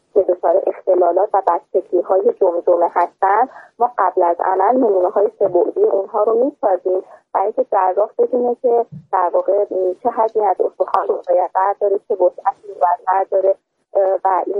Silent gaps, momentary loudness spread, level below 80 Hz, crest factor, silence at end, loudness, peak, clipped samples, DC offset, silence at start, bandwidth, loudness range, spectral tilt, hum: none; 5 LU; -68 dBFS; 16 dB; 0 s; -17 LUFS; 0 dBFS; under 0.1%; under 0.1%; 0.15 s; 4 kHz; 2 LU; -8.5 dB/octave; none